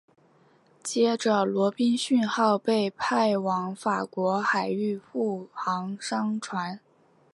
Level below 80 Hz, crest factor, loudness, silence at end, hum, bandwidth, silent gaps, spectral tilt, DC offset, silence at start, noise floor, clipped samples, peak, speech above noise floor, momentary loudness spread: -76 dBFS; 18 dB; -26 LUFS; 0.55 s; none; 11.5 kHz; none; -5 dB/octave; under 0.1%; 0.85 s; -61 dBFS; under 0.1%; -10 dBFS; 35 dB; 8 LU